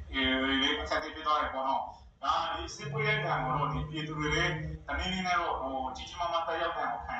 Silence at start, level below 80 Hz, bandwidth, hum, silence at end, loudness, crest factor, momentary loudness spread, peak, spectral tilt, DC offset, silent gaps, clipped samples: 0 s; -48 dBFS; 8.2 kHz; none; 0 s; -31 LUFS; 16 dB; 9 LU; -16 dBFS; -4.5 dB/octave; under 0.1%; none; under 0.1%